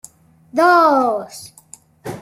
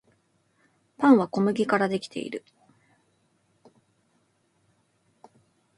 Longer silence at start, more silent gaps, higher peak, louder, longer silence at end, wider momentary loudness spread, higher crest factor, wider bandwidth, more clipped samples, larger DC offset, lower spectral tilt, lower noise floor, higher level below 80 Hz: second, 0.55 s vs 1 s; neither; first, -2 dBFS vs -6 dBFS; first, -15 LUFS vs -24 LUFS; second, 0 s vs 3.4 s; first, 23 LU vs 16 LU; second, 16 dB vs 24 dB; first, 16 kHz vs 11.5 kHz; neither; neither; second, -4.5 dB/octave vs -6.5 dB/octave; second, -46 dBFS vs -69 dBFS; first, -64 dBFS vs -74 dBFS